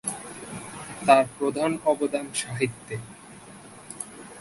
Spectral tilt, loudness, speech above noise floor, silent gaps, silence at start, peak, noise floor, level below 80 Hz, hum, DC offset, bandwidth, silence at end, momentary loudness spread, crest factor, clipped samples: -4 dB/octave; -25 LUFS; 22 dB; none; 0.05 s; -2 dBFS; -46 dBFS; -62 dBFS; none; under 0.1%; 12 kHz; 0 s; 25 LU; 24 dB; under 0.1%